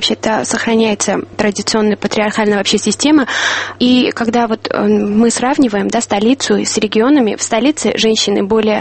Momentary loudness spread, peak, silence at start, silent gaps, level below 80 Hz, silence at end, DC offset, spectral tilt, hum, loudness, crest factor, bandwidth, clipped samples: 4 LU; 0 dBFS; 0 s; none; -46 dBFS; 0 s; under 0.1%; -3.5 dB/octave; none; -13 LUFS; 12 dB; 8.8 kHz; under 0.1%